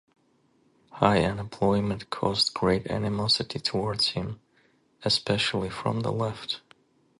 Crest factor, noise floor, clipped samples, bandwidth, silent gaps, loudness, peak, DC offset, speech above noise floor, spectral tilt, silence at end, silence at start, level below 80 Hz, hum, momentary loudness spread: 24 dB; -66 dBFS; under 0.1%; 11.5 kHz; none; -26 LUFS; -4 dBFS; under 0.1%; 40 dB; -5 dB/octave; 0.6 s; 0.95 s; -52 dBFS; none; 10 LU